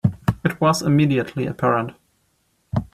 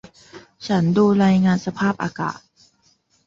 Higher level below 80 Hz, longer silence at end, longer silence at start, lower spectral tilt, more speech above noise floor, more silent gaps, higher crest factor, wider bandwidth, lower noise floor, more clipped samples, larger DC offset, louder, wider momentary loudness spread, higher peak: first, -46 dBFS vs -56 dBFS; second, 0.1 s vs 0.9 s; second, 0.05 s vs 0.35 s; about the same, -6.5 dB/octave vs -7.5 dB/octave; first, 47 dB vs 43 dB; neither; about the same, 18 dB vs 14 dB; first, 15 kHz vs 7.6 kHz; first, -66 dBFS vs -61 dBFS; neither; neither; about the same, -20 LUFS vs -19 LUFS; about the same, 10 LU vs 12 LU; about the same, -4 dBFS vs -6 dBFS